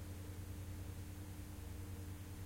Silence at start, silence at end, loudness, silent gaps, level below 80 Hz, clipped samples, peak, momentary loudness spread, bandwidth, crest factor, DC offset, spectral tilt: 0 s; 0 s; -50 LUFS; none; -56 dBFS; under 0.1%; -38 dBFS; 2 LU; 16.5 kHz; 12 dB; under 0.1%; -5.5 dB/octave